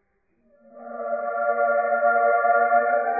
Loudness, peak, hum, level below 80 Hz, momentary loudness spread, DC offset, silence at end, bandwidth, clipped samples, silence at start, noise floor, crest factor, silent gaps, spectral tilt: -21 LUFS; -8 dBFS; none; -78 dBFS; 11 LU; under 0.1%; 0 s; 2.6 kHz; under 0.1%; 0.75 s; -67 dBFS; 14 dB; none; -10 dB/octave